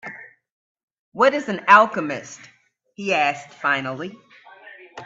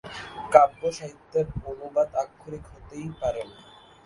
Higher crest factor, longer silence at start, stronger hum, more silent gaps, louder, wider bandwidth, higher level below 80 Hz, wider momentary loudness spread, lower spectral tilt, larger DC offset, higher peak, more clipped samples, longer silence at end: about the same, 22 dB vs 26 dB; about the same, 0.05 s vs 0.05 s; neither; first, 0.52-0.75 s, 0.83-0.88 s, 0.99-1.12 s vs none; first, -19 LUFS vs -25 LUFS; second, 8 kHz vs 11.5 kHz; second, -70 dBFS vs -50 dBFS; first, 26 LU vs 22 LU; second, -4 dB/octave vs -5.5 dB/octave; neither; about the same, 0 dBFS vs 0 dBFS; neither; second, 0 s vs 0.55 s